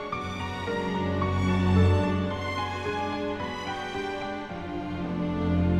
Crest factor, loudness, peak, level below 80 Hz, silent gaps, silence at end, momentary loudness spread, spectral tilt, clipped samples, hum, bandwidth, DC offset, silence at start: 18 dB; -28 LUFS; -10 dBFS; -44 dBFS; none; 0 s; 10 LU; -7 dB/octave; under 0.1%; none; 9.4 kHz; under 0.1%; 0 s